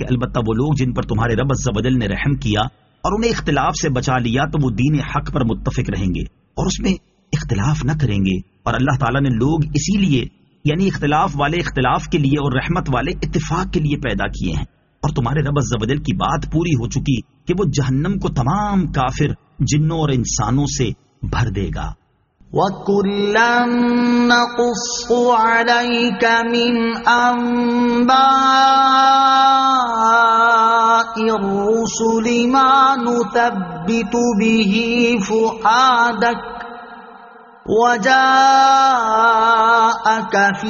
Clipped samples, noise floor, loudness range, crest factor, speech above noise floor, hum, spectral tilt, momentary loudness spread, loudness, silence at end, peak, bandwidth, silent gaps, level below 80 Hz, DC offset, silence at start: under 0.1%; -53 dBFS; 7 LU; 16 dB; 37 dB; none; -4.5 dB/octave; 10 LU; -16 LUFS; 0 s; 0 dBFS; 7.4 kHz; none; -34 dBFS; under 0.1%; 0 s